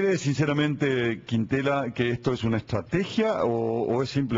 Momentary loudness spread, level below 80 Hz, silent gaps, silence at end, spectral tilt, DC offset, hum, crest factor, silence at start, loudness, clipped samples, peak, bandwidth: 3 LU; -54 dBFS; none; 0 s; -6.5 dB/octave; under 0.1%; none; 14 dB; 0 s; -26 LUFS; under 0.1%; -12 dBFS; 7.8 kHz